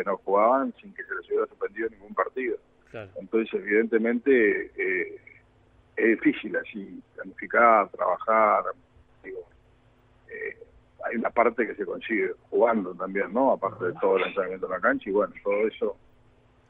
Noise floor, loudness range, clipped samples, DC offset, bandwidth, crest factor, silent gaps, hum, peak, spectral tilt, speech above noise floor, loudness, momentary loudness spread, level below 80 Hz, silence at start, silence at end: -60 dBFS; 5 LU; under 0.1%; under 0.1%; 4 kHz; 20 dB; none; none; -6 dBFS; -8.5 dB/octave; 34 dB; -25 LUFS; 18 LU; -64 dBFS; 0 s; 0.75 s